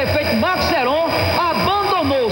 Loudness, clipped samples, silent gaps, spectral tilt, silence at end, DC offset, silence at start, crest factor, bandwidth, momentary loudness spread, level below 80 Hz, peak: -17 LUFS; under 0.1%; none; -5 dB/octave; 0 s; under 0.1%; 0 s; 12 dB; 16.5 kHz; 1 LU; -42 dBFS; -4 dBFS